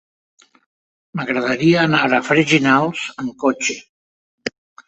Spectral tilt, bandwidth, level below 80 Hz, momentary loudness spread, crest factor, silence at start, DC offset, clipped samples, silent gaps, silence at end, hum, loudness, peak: -4.5 dB/octave; 8.2 kHz; -60 dBFS; 16 LU; 18 dB; 1.15 s; under 0.1%; under 0.1%; 3.89-4.38 s; 0.4 s; none; -17 LUFS; -2 dBFS